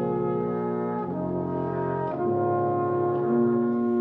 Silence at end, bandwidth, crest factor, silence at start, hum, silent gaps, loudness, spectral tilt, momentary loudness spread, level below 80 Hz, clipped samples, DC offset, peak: 0 s; 3.7 kHz; 12 dB; 0 s; 60 Hz at -45 dBFS; none; -26 LUFS; -12 dB/octave; 5 LU; -64 dBFS; under 0.1%; under 0.1%; -14 dBFS